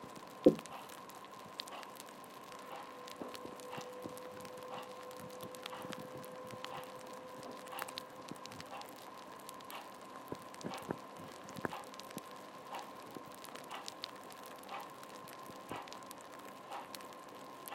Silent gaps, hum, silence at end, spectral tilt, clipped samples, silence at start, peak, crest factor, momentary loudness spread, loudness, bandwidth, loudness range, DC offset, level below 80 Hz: none; none; 0 s; -4.5 dB/octave; under 0.1%; 0 s; -10 dBFS; 34 dB; 7 LU; -45 LUFS; 16.5 kHz; 2 LU; under 0.1%; -80 dBFS